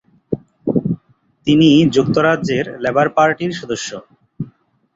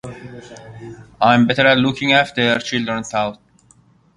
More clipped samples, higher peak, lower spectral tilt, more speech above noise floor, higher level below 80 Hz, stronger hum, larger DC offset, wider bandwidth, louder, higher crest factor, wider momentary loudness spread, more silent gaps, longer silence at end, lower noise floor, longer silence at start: neither; about the same, -2 dBFS vs 0 dBFS; about the same, -6 dB/octave vs -5 dB/octave; about the same, 39 dB vs 36 dB; about the same, -50 dBFS vs -52 dBFS; neither; neither; second, 7.8 kHz vs 11 kHz; about the same, -16 LUFS vs -16 LUFS; about the same, 16 dB vs 18 dB; second, 19 LU vs 23 LU; neither; second, 0.5 s vs 0.8 s; about the same, -54 dBFS vs -53 dBFS; first, 0.3 s vs 0.05 s